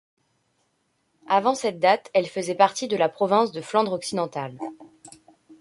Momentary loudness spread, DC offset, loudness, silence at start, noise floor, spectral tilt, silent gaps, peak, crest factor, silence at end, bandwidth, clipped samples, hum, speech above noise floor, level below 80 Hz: 10 LU; under 0.1%; -23 LUFS; 1.3 s; -71 dBFS; -4 dB/octave; none; -4 dBFS; 22 dB; 0.5 s; 11.5 kHz; under 0.1%; none; 48 dB; -72 dBFS